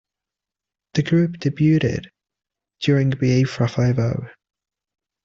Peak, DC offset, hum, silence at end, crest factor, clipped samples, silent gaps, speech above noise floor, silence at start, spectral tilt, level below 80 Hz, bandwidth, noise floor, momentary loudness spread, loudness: -6 dBFS; under 0.1%; none; 0.95 s; 16 dB; under 0.1%; none; 69 dB; 0.95 s; -7.5 dB/octave; -52 dBFS; 7.4 kHz; -88 dBFS; 8 LU; -20 LUFS